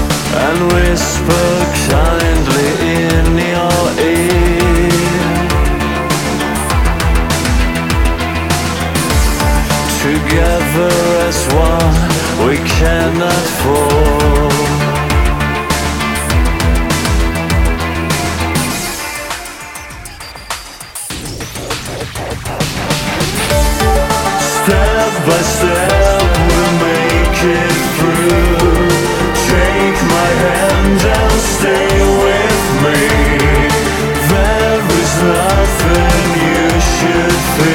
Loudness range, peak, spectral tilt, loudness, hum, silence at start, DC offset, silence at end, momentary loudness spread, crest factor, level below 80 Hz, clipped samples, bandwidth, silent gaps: 6 LU; 0 dBFS; -4.5 dB/octave; -12 LUFS; none; 0 s; under 0.1%; 0 s; 7 LU; 12 dB; -18 dBFS; under 0.1%; 18 kHz; none